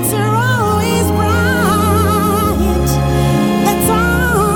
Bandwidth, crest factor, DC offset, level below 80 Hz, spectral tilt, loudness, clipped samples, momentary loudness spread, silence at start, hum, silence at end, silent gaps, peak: 18.5 kHz; 10 dB; under 0.1%; -24 dBFS; -5.5 dB/octave; -13 LUFS; under 0.1%; 2 LU; 0 s; none; 0 s; none; -2 dBFS